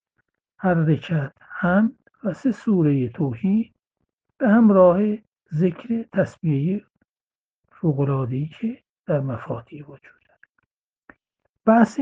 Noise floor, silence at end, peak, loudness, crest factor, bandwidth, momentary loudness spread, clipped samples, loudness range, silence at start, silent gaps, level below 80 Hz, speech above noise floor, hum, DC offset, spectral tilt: under -90 dBFS; 0 s; -2 dBFS; -22 LUFS; 20 dB; 7.6 kHz; 15 LU; under 0.1%; 7 LU; 0.6 s; 5.28-5.32 s, 7.09-7.14 s, 7.21-7.27 s, 7.35-7.63 s, 8.90-9.04 s, 10.50-10.55 s, 10.66-11.02 s, 11.49-11.53 s; -60 dBFS; over 70 dB; none; under 0.1%; -9.5 dB/octave